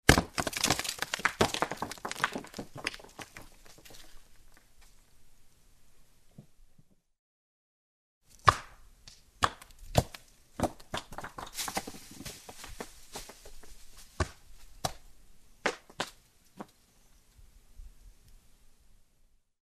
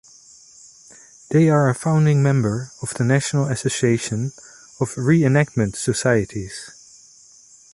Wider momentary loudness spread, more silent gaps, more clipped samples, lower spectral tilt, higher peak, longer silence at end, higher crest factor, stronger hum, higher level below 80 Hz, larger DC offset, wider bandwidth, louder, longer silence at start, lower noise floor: first, 25 LU vs 13 LU; first, 7.19-8.21 s vs none; neither; second, -3.5 dB/octave vs -6 dB/octave; about the same, -2 dBFS vs -4 dBFS; first, 1.3 s vs 1.05 s; first, 34 dB vs 18 dB; neither; about the same, -48 dBFS vs -52 dBFS; neither; first, 14 kHz vs 11.5 kHz; second, -33 LUFS vs -19 LUFS; second, 0.05 s vs 1.3 s; first, -66 dBFS vs -49 dBFS